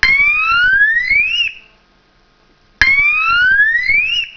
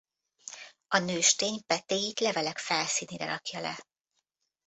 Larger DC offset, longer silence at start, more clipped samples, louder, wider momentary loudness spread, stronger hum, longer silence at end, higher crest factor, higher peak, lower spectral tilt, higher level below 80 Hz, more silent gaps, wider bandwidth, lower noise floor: neither; second, 0 s vs 0.45 s; first, 0.1% vs under 0.1%; first, -10 LUFS vs -29 LUFS; second, 4 LU vs 20 LU; neither; second, 0.05 s vs 0.85 s; second, 14 dB vs 24 dB; first, 0 dBFS vs -8 dBFS; about the same, -0.5 dB/octave vs -1.5 dB/octave; first, -38 dBFS vs -74 dBFS; neither; second, 5.4 kHz vs 8.4 kHz; second, -53 dBFS vs -81 dBFS